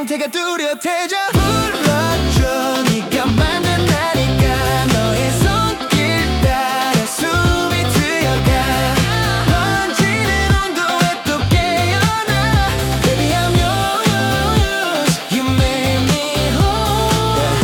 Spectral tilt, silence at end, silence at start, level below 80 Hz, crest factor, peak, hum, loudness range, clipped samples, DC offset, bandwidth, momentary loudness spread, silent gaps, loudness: -4.5 dB/octave; 0 s; 0 s; -26 dBFS; 12 dB; -2 dBFS; none; 1 LU; under 0.1%; under 0.1%; 18 kHz; 2 LU; none; -15 LUFS